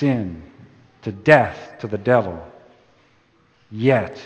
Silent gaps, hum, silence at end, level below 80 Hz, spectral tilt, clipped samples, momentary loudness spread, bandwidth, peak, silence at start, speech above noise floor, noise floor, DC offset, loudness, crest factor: none; none; 0 s; -54 dBFS; -8 dB/octave; under 0.1%; 20 LU; 8.6 kHz; 0 dBFS; 0 s; 39 dB; -58 dBFS; under 0.1%; -19 LUFS; 22 dB